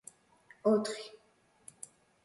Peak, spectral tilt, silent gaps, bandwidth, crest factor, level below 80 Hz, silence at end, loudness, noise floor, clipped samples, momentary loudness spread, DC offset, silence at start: -18 dBFS; -5 dB/octave; none; 11.5 kHz; 18 dB; -80 dBFS; 1.15 s; -33 LUFS; -69 dBFS; under 0.1%; 25 LU; under 0.1%; 0.65 s